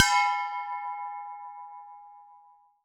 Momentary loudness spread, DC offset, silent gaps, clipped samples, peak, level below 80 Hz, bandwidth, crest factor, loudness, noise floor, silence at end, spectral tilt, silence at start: 24 LU; under 0.1%; none; under 0.1%; -2 dBFS; -72 dBFS; 19 kHz; 30 dB; -29 LUFS; -58 dBFS; 0.5 s; 4.5 dB/octave; 0 s